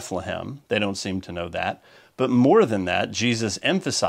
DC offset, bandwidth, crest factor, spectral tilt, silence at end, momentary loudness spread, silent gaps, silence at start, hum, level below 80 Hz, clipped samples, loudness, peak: under 0.1%; 14 kHz; 18 dB; -4.5 dB/octave; 0 s; 13 LU; none; 0 s; none; -58 dBFS; under 0.1%; -23 LUFS; -6 dBFS